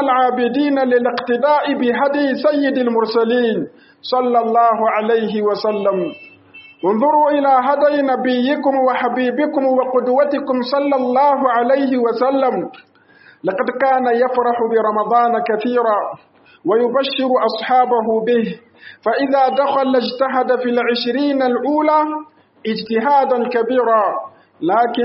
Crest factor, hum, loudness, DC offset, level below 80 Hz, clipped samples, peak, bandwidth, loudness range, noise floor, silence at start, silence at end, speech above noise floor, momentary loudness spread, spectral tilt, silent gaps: 14 dB; none; -16 LUFS; under 0.1%; -68 dBFS; under 0.1%; -2 dBFS; 5.8 kHz; 2 LU; -48 dBFS; 0 s; 0 s; 32 dB; 7 LU; -3 dB/octave; none